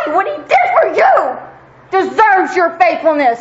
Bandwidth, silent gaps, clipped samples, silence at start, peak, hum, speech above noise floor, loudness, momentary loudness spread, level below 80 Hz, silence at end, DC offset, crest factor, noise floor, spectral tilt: 8 kHz; none; under 0.1%; 0 s; 0 dBFS; none; 25 dB; -12 LUFS; 7 LU; -56 dBFS; 0 s; under 0.1%; 12 dB; -37 dBFS; -4 dB/octave